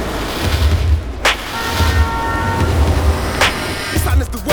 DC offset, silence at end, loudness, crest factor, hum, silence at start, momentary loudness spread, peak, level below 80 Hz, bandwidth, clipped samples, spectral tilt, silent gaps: under 0.1%; 0 s; -16 LUFS; 16 dB; none; 0 s; 4 LU; 0 dBFS; -20 dBFS; over 20 kHz; under 0.1%; -4.5 dB/octave; none